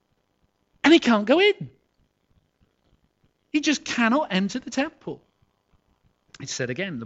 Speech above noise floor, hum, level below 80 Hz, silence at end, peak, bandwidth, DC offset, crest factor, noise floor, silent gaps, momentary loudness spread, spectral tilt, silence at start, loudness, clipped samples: 47 dB; none; -66 dBFS; 0 s; -6 dBFS; 8.2 kHz; under 0.1%; 20 dB; -70 dBFS; none; 21 LU; -4 dB/octave; 0.85 s; -22 LUFS; under 0.1%